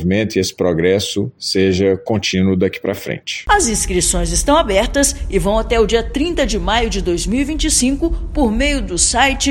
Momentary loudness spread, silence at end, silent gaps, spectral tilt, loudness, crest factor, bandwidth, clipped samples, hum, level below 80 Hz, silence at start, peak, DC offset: 6 LU; 0 s; none; -3.5 dB/octave; -16 LUFS; 16 dB; 17 kHz; under 0.1%; none; -26 dBFS; 0 s; 0 dBFS; under 0.1%